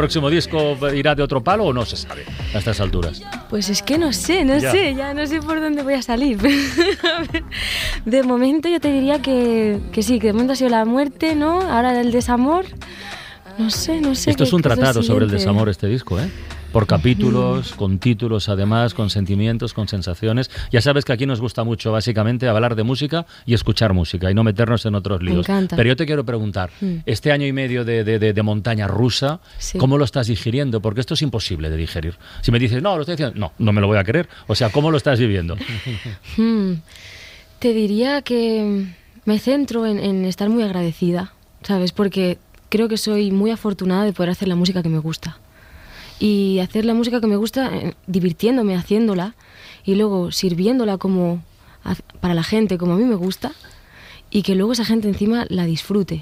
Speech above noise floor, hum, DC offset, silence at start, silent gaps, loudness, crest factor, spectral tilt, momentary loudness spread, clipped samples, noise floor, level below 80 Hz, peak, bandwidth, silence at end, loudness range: 25 dB; none; under 0.1%; 0 s; none; -19 LUFS; 16 dB; -6 dB/octave; 9 LU; under 0.1%; -43 dBFS; -38 dBFS; -2 dBFS; 16 kHz; 0 s; 3 LU